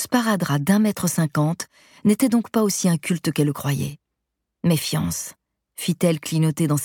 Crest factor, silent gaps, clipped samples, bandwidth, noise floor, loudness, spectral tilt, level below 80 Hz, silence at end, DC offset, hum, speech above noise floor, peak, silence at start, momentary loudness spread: 18 dB; none; under 0.1%; 19 kHz; -80 dBFS; -22 LUFS; -5.5 dB/octave; -56 dBFS; 0 s; under 0.1%; none; 59 dB; -4 dBFS; 0 s; 10 LU